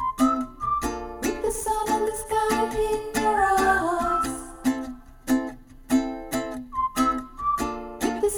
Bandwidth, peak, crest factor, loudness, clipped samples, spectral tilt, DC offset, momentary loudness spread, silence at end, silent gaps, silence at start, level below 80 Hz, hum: over 20 kHz; -10 dBFS; 16 dB; -25 LUFS; under 0.1%; -4 dB/octave; under 0.1%; 9 LU; 0 s; none; 0 s; -44 dBFS; none